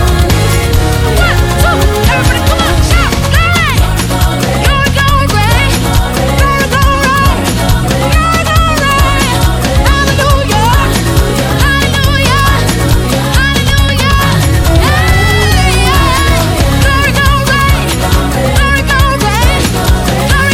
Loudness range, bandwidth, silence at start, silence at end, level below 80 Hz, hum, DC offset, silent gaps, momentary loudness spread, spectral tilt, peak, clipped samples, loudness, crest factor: 1 LU; 17.5 kHz; 0 s; 0 s; -14 dBFS; none; under 0.1%; none; 3 LU; -4.5 dB/octave; 0 dBFS; 0.4%; -9 LUFS; 8 dB